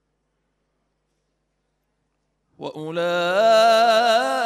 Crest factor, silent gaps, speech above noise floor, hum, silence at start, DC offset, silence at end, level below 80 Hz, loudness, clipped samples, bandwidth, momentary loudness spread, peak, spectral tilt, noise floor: 16 dB; none; 54 dB; 50 Hz at -70 dBFS; 2.6 s; under 0.1%; 0 s; -76 dBFS; -17 LUFS; under 0.1%; 15 kHz; 19 LU; -6 dBFS; -3 dB/octave; -73 dBFS